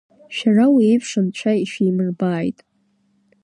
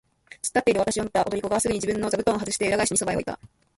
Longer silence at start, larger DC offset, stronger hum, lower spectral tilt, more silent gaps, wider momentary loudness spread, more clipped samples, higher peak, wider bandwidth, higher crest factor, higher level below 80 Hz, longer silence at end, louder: second, 0.3 s vs 0.45 s; neither; neither; first, -6.5 dB/octave vs -3.5 dB/octave; neither; first, 10 LU vs 7 LU; neither; first, -4 dBFS vs -8 dBFS; second, 10.5 kHz vs 12 kHz; about the same, 14 dB vs 18 dB; second, -66 dBFS vs -52 dBFS; first, 0.95 s vs 0.3 s; first, -18 LUFS vs -24 LUFS